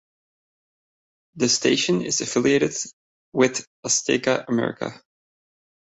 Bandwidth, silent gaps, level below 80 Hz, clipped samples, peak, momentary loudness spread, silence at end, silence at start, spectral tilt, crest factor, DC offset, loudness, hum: 8.4 kHz; 2.93-3.32 s, 3.67-3.83 s; -64 dBFS; under 0.1%; -4 dBFS; 11 LU; 0.9 s; 1.35 s; -3 dB/octave; 20 dB; under 0.1%; -22 LUFS; none